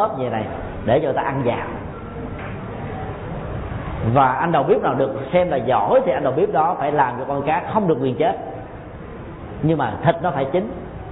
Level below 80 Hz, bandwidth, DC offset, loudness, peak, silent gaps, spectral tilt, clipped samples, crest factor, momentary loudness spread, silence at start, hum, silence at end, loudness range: -40 dBFS; 4 kHz; under 0.1%; -20 LUFS; -4 dBFS; none; -12 dB/octave; under 0.1%; 16 dB; 15 LU; 0 s; none; 0 s; 6 LU